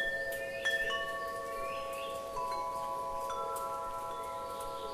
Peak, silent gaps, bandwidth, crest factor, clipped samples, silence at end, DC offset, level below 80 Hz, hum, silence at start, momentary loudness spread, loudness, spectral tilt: -22 dBFS; none; 15.5 kHz; 16 dB; under 0.1%; 0 s; under 0.1%; -58 dBFS; none; 0 s; 7 LU; -37 LUFS; -2 dB/octave